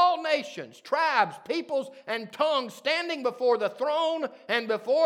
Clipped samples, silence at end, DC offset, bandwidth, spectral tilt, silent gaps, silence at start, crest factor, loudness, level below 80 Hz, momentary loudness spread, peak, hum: under 0.1%; 0 s; under 0.1%; 15 kHz; -3.5 dB/octave; none; 0 s; 20 dB; -27 LUFS; under -90 dBFS; 9 LU; -8 dBFS; none